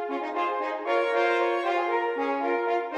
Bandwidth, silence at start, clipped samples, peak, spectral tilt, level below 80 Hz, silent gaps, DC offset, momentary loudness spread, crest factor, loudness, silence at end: 9.4 kHz; 0 s; under 0.1%; -12 dBFS; -2.5 dB/octave; -84 dBFS; none; under 0.1%; 5 LU; 14 dB; -26 LUFS; 0 s